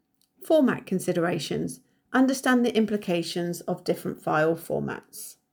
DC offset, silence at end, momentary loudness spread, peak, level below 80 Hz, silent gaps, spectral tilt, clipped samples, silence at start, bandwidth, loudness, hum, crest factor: under 0.1%; 0.2 s; 12 LU; -10 dBFS; -66 dBFS; none; -5.5 dB/octave; under 0.1%; 0.4 s; over 20 kHz; -26 LUFS; none; 16 dB